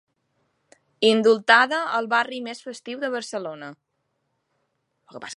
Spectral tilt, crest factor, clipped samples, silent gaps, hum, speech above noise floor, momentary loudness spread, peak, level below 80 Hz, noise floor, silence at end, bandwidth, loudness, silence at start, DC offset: -3.5 dB/octave; 24 dB; under 0.1%; none; none; 53 dB; 19 LU; 0 dBFS; -80 dBFS; -75 dBFS; 0 s; 11 kHz; -21 LUFS; 1 s; under 0.1%